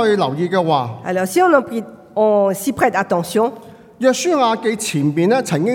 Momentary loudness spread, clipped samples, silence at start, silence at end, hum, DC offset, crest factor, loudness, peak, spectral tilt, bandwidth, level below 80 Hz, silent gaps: 7 LU; under 0.1%; 0 s; 0 s; none; under 0.1%; 16 dB; -17 LUFS; 0 dBFS; -5 dB/octave; 18 kHz; -60 dBFS; none